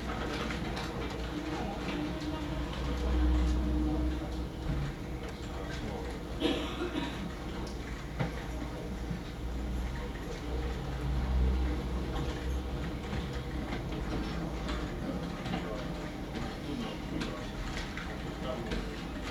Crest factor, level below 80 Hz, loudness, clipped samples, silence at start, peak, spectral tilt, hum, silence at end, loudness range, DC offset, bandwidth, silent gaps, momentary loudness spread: 18 dB; -38 dBFS; -36 LUFS; under 0.1%; 0 s; -16 dBFS; -6 dB/octave; none; 0 s; 4 LU; under 0.1%; 13.5 kHz; none; 8 LU